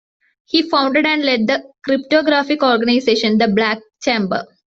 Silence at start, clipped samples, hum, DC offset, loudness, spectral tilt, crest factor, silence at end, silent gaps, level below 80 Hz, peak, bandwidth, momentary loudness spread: 0.55 s; under 0.1%; none; under 0.1%; -16 LUFS; -5 dB/octave; 14 dB; 0.25 s; none; -58 dBFS; -2 dBFS; 7.8 kHz; 6 LU